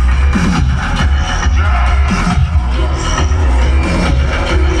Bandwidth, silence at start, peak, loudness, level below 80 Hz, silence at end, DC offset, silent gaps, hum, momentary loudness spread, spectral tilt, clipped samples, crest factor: 9.6 kHz; 0 s; -2 dBFS; -13 LUFS; -12 dBFS; 0 s; 0.3%; none; none; 2 LU; -5.5 dB/octave; under 0.1%; 10 dB